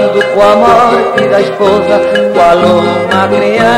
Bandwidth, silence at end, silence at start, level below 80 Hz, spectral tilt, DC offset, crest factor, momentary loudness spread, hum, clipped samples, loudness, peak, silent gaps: 14 kHz; 0 s; 0 s; -40 dBFS; -5.5 dB/octave; under 0.1%; 8 dB; 4 LU; none; 1%; -8 LUFS; 0 dBFS; none